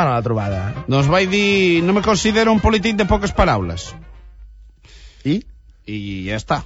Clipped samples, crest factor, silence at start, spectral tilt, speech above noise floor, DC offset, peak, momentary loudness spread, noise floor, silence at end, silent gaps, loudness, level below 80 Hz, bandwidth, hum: under 0.1%; 16 dB; 0 s; -5.5 dB/octave; 26 dB; under 0.1%; -2 dBFS; 13 LU; -43 dBFS; 0 s; none; -17 LUFS; -32 dBFS; 8 kHz; none